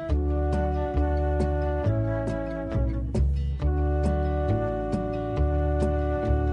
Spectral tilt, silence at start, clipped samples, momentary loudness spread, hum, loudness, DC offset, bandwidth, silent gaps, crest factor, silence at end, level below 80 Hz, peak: -9 dB/octave; 0 s; under 0.1%; 3 LU; none; -27 LUFS; under 0.1%; 5.6 kHz; none; 12 dB; 0 s; -28 dBFS; -12 dBFS